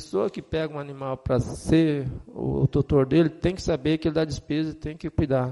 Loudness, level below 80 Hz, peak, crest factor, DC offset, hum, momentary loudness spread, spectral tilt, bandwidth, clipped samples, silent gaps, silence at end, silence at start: -25 LUFS; -42 dBFS; -10 dBFS; 16 dB; under 0.1%; none; 11 LU; -7.5 dB/octave; 11.5 kHz; under 0.1%; none; 0 s; 0 s